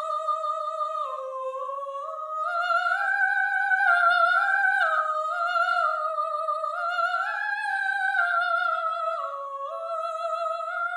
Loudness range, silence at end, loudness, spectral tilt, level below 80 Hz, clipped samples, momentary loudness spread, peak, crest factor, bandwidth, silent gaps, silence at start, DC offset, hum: 5 LU; 0 s; -25 LUFS; 4.5 dB/octave; under -90 dBFS; under 0.1%; 12 LU; -10 dBFS; 16 dB; 12 kHz; none; 0 s; under 0.1%; none